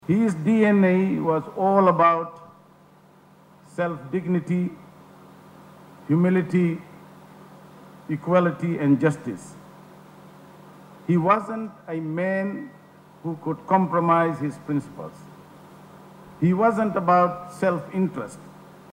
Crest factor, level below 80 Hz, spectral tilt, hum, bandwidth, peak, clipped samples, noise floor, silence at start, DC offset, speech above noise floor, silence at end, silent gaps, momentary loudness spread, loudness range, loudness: 18 dB; -68 dBFS; -8.5 dB/octave; none; 10 kHz; -6 dBFS; under 0.1%; -53 dBFS; 0.1 s; under 0.1%; 31 dB; 0.45 s; none; 18 LU; 5 LU; -22 LUFS